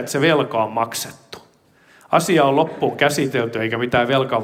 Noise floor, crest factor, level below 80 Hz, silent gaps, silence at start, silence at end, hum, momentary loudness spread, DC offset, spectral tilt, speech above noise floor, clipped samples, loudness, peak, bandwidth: -54 dBFS; 18 dB; -56 dBFS; none; 0 s; 0 s; none; 8 LU; under 0.1%; -4.5 dB/octave; 35 dB; under 0.1%; -19 LUFS; 0 dBFS; 16.5 kHz